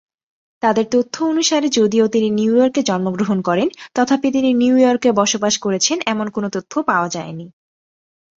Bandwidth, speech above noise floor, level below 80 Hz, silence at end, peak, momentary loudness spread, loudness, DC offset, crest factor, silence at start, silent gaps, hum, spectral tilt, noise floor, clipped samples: 7.8 kHz; over 74 dB; -60 dBFS; 0.85 s; -2 dBFS; 7 LU; -17 LUFS; under 0.1%; 16 dB; 0.65 s; none; none; -4 dB/octave; under -90 dBFS; under 0.1%